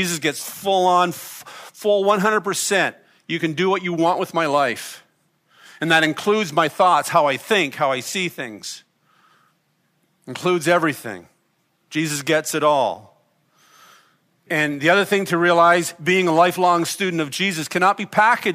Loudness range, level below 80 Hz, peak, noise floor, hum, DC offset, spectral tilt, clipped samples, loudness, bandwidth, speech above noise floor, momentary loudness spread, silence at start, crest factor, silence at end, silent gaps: 7 LU; -72 dBFS; -2 dBFS; -66 dBFS; none; under 0.1%; -4 dB/octave; under 0.1%; -19 LUFS; 15.5 kHz; 47 dB; 14 LU; 0 s; 18 dB; 0 s; none